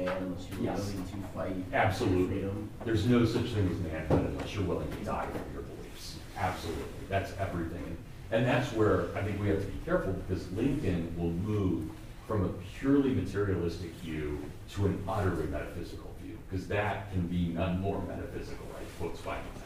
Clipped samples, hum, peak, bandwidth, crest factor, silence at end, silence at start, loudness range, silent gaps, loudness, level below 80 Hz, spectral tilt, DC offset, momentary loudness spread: under 0.1%; none; -12 dBFS; 15.5 kHz; 20 dB; 0 s; 0 s; 5 LU; none; -33 LUFS; -46 dBFS; -7 dB/octave; under 0.1%; 14 LU